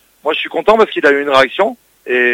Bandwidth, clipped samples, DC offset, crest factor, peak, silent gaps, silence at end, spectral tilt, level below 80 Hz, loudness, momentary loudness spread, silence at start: 16 kHz; under 0.1%; under 0.1%; 14 dB; 0 dBFS; none; 0 s; -4 dB/octave; -50 dBFS; -13 LUFS; 7 LU; 0.25 s